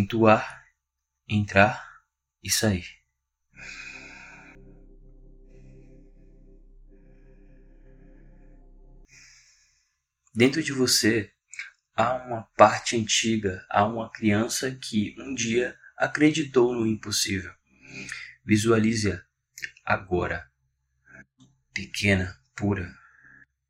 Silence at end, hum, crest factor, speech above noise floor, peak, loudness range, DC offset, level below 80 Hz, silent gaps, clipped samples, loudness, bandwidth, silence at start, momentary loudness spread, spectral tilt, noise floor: 0.75 s; none; 26 dB; 58 dB; -2 dBFS; 8 LU; under 0.1%; -54 dBFS; none; under 0.1%; -24 LUFS; 16 kHz; 0 s; 19 LU; -4 dB/octave; -82 dBFS